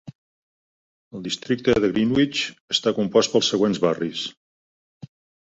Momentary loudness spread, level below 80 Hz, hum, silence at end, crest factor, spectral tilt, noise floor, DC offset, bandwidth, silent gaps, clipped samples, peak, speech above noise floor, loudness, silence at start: 11 LU; -54 dBFS; none; 1.2 s; 20 dB; -4.5 dB/octave; under -90 dBFS; under 0.1%; 8 kHz; 0.15-1.11 s, 2.60-2.68 s; under 0.1%; -4 dBFS; over 69 dB; -21 LUFS; 0.05 s